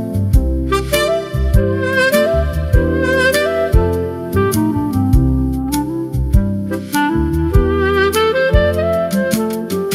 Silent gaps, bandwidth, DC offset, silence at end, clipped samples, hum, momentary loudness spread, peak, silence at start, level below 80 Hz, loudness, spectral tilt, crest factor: none; 16 kHz; under 0.1%; 0 s; under 0.1%; none; 6 LU; 0 dBFS; 0 s; -20 dBFS; -15 LUFS; -6 dB/octave; 14 dB